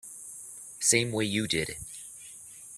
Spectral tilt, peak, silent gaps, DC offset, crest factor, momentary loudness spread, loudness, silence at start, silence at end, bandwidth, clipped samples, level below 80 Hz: -2.5 dB/octave; -10 dBFS; none; under 0.1%; 22 dB; 20 LU; -27 LUFS; 0.05 s; 0 s; 15.5 kHz; under 0.1%; -60 dBFS